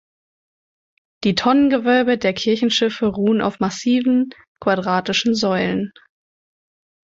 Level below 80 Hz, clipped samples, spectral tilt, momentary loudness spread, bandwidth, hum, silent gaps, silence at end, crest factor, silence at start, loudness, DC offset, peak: -56 dBFS; under 0.1%; -5 dB/octave; 7 LU; 7.8 kHz; none; 4.48-4.55 s; 1.2 s; 16 dB; 1.2 s; -18 LUFS; under 0.1%; -4 dBFS